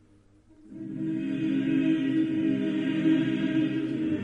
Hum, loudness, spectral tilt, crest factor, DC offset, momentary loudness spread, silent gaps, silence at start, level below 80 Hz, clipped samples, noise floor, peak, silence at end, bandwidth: none; -27 LUFS; -8 dB/octave; 14 dB; under 0.1%; 7 LU; none; 0.65 s; -64 dBFS; under 0.1%; -59 dBFS; -14 dBFS; 0 s; 7 kHz